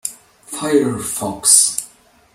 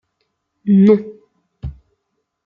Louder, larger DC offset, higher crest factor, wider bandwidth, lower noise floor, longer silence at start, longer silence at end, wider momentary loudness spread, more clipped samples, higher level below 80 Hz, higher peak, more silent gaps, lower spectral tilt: about the same, -14 LUFS vs -14 LUFS; neither; about the same, 18 dB vs 16 dB; first, over 20 kHz vs 4.7 kHz; second, -47 dBFS vs -73 dBFS; second, 0.05 s vs 0.65 s; second, 0.45 s vs 0.75 s; second, 17 LU vs 22 LU; neither; second, -56 dBFS vs -42 dBFS; about the same, 0 dBFS vs -2 dBFS; neither; second, -2 dB/octave vs -11 dB/octave